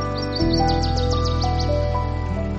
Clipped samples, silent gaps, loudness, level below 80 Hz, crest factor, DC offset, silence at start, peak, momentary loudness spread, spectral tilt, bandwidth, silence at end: under 0.1%; none; -22 LUFS; -26 dBFS; 14 dB; under 0.1%; 0 s; -8 dBFS; 5 LU; -6.5 dB/octave; 8 kHz; 0 s